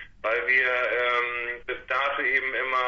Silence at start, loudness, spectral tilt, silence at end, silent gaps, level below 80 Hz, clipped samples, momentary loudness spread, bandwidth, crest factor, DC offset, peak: 0 s; -24 LUFS; -3.5 dB/octave; 0 s; none; -58 dBFS; under 0.1%; 9 LU; 7.2 kHz; 14 dB; under 0.1%; -12 dBFS